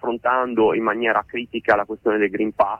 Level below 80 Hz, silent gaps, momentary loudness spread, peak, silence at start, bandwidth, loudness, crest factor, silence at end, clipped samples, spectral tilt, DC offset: -56 dBFS; none; 4 LU; -4 dBFS; 0.05 s; 5.8 kHz; -20 LUFS; 16 dB; 0 s; under 0.1%; -7 dB/octave; under 0.1%